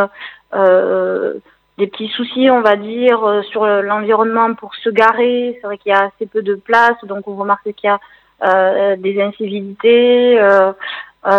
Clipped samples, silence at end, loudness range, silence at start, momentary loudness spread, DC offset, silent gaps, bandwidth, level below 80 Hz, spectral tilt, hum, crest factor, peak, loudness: under 0.1%; 0 s; 2 LU; 0 s; 12 LU; under 0.1%; none; 6.6 kHz; -66 dBFS; -6.5 dB/octave; none; 14 dB; 0 dBFS; -14 LUFS